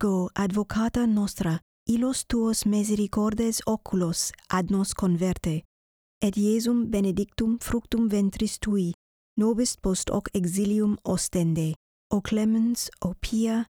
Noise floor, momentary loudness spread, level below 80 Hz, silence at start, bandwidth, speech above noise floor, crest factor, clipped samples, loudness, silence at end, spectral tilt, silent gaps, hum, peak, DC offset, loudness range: under -90 dBFS; 6 LU; -44 dBFS; 0 s; 18.5 kHz; over 65 dB; 14 dB; under 0.1%; -26 LUFS; 0.05 s; -5.5 dB/octave; 1.62-1.86 s, 5.65-6.21 s, 8.94-9.36 s, 11.76-12.10 s; none; -10 dBFS; under 0.1%; 1 LU